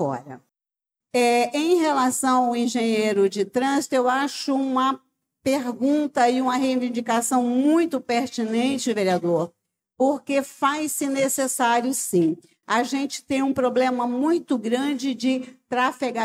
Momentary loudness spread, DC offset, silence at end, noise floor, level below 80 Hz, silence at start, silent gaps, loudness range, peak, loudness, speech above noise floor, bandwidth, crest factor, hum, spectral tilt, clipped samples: 5 LU; under 0.1%; 0 s; -87 dBFS; -74 dBFS; 0 s; none; 2 LU; -8 dBFS; -22 LUFS; 65 dB; 16 kHz; 14 dB; none; -4 dB/octave; under 0.1%